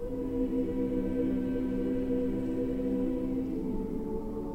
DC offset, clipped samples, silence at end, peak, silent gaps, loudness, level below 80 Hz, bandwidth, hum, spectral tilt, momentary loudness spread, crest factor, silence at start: 0.2%; under 0.1%; 0 s; -18 dBFS; none; -32 LUFS; -42 dBFS; 8.4 kHz; none; -9.5 dB/octave; 4 LU; 12 dB; 0 s